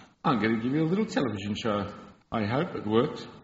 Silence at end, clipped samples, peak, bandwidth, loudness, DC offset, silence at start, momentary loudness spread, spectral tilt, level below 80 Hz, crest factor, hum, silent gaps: 0.05 s; under 0.1%; -10 dBFS; 8 kHz; -28 LUFS; under 0.1%; 0 s; 6 LU; -5.5 dB/octave; -60 dBFS; 18 dB; none; none